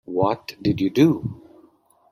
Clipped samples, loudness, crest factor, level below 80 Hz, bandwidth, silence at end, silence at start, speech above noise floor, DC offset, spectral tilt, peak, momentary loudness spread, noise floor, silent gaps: under 0.1%; -21 LUFS; 18 dB; -54 dBFS; 14.5 kHz; 0.75 s; 0.1 s; 37 dB; under 0.1%; -7.5 dB/octave; -4 dBFS; 9 LU; -57 dBFS; none